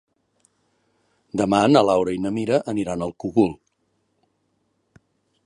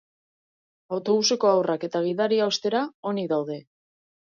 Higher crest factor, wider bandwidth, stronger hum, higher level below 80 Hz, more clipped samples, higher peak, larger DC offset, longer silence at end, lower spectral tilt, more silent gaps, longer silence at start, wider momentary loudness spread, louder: first, 22 dB vs 16 dB; first, 11.5 kHz vs 7.4 kHz; neither; first, -56 dBFS vs -78 dBFS; neither; first, -2 dBFS vs -8 dBFS; neither; first, 1.9 s vs 0.7 s; first, -6 dB/octave vs -4 dB/octave; second, none vs 2.94-3.03 s; first, 1.35 s vs 0.9 s; about the same, 11 LU vs 10 LU; first, -21 LUFS vs -24 LUFS